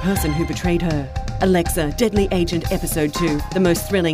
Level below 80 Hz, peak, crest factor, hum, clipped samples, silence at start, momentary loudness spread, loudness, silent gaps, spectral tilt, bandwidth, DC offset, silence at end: -28 dBFS; -2 dBFS; 16 dB; none; under 0.1%; 0 s; 4 LU; -20 LUFS; none; -5.5 dB/octave; 16 kHz; under 0.1%; 0 s